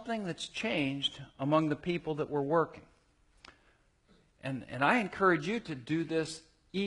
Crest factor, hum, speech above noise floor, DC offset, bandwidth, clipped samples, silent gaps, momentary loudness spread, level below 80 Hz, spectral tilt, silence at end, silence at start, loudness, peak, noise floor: 20 dB; none; 36 dB; under 0.1%; 11 kHz; under 0.1%; none; 12 LU; -66 dBFS; -5.5 dB/octave; 0 s; 0 s; -32 LUFS; -12 dBFS; -68 dBFS